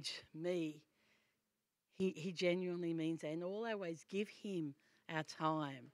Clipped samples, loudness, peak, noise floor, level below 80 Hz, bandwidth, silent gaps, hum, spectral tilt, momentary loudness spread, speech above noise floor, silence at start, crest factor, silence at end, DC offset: under 0.1%; -43 LUFS; -24 dBFS; -89 dBFS; -88 dBFS; 13 kHz; none; none; -5.5 dB/octave; 7 LU; 47 dB; 0 s; 20 dB; 0.05 s; under 0.1%